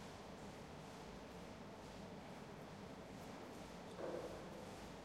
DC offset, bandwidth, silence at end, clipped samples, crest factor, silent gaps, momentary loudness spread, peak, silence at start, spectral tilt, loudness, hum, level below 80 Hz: under 0.1%; 16 kHz; 0 s; under 0.1%; 16 dB; none; 5 LU; -36 dBFS; 0 s; -5 dB/octave; -53 LUFS; none; -68 dBFS